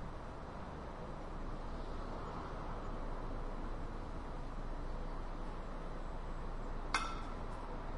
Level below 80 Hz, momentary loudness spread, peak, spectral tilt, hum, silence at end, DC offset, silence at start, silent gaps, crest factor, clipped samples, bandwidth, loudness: -44 dBFS; 5 LU; -20 dBFS; -5.5 dB/octave; none; 0 s; under 0.1%; 0 s; none; 22 dB; under 0.1%; 11 kHz; -46 LUFS